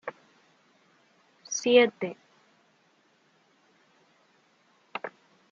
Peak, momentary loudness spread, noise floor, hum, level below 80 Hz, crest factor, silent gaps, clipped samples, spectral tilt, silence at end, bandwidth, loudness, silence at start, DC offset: -8 dBFS; 22 LU; -66 dBFS; none; -88 dBFS; 26 dB; none; under 0.1%; -2 dB/octave; 0.45 s; 7.4 kHz; -26 LUFS; 0.05 s; under 0.1%